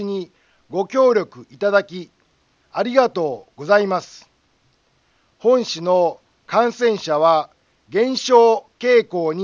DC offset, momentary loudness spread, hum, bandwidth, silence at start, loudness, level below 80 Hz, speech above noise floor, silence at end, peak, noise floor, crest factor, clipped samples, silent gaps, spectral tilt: under 0.1%; 13 LU; none; 7.4 kHz; 0 s; -18 LUFS; -70 dBFS; 44 dB; 0 s; 0 dBFS; -62 dBFS; 18 dB; under 0.1%; none; -4.5 dB/octave